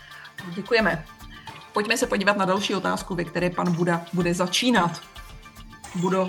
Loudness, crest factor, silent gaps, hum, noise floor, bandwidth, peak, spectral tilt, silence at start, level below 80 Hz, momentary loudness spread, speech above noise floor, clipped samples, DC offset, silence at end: -24 LUFS; 20 dB; none; none; -44 dBFS; 18.5 kHz; -4 dBFS; -4.5 dB/octave; 0 s; -50 dBFS; 21 LU; 20 dB; under 0.1%; under 0.1%; 0 s